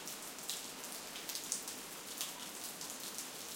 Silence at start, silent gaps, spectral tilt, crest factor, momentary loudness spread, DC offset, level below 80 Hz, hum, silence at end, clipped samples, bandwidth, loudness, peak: 0 s; none; 0 dB/octave; 30 dB; 5 LU; under 0.1%; -82 dBFS; none; 0 s; under 0.1%; 17 kHz; -42 LUFS; -16 dBFS